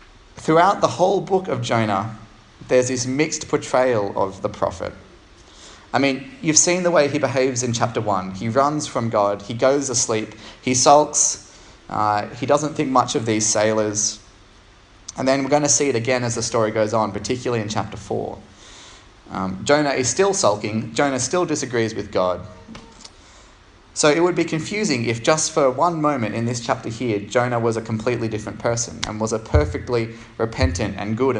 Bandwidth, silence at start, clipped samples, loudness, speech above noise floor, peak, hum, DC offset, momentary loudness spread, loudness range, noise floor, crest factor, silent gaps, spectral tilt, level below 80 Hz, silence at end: 11 kHz; 0.35 s; under 0.1%; -20 LUFS; 29 dB; 0 dBFS; none; under 0.1%; 10 LU; 4 LU; -49 dBFS; 20 dB; none; -4 dB/octave; -42 dBFS; 0 s